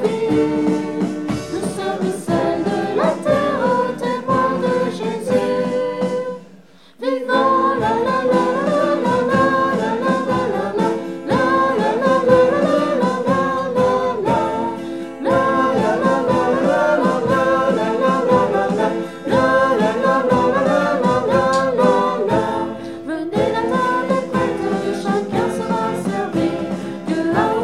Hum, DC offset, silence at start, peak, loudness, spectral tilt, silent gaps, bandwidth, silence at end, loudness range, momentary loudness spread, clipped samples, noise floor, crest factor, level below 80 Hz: none; 0.3%; 0 s; -2 dBFS; -18 LUFS; -6.5 dB/octave; none; 12.5 kHz; 0 s; 3 LU; 7 LU; under 0.1%; -46 dBFS; 16 dB; -48 dBFS